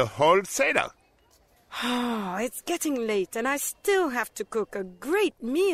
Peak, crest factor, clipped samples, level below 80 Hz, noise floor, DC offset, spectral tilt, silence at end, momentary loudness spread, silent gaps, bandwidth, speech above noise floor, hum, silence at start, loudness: -4 dBFS; 22 dB; under 0.1%; -62 dBFS; -62 dBFS; under 0.1%; -3.5 dB/octave; 0 s; 9 LU; none; 16 kHz; 36 dB; none; 0 s; -26 LUFS